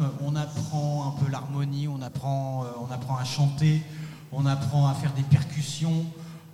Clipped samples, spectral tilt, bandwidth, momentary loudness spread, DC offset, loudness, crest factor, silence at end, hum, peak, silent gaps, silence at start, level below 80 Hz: under 0.1%; -6.5 dB/octave; 13 kHz; 10 LU; under 0.1%; -27 LUFS; 20 dB; 0 s; none; -8 dBFS; none; 0 s; -60 dBFS